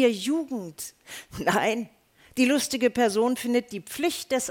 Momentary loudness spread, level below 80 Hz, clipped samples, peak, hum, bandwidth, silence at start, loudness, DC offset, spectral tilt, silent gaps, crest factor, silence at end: 15 LU; -60 dBFS; under 0.1%; -8 dBFS; none; 17.5 kHz; 0 s; -26 LUFS; under 0.1%; -3.5 dB/octave; none; 18 dB; 0 s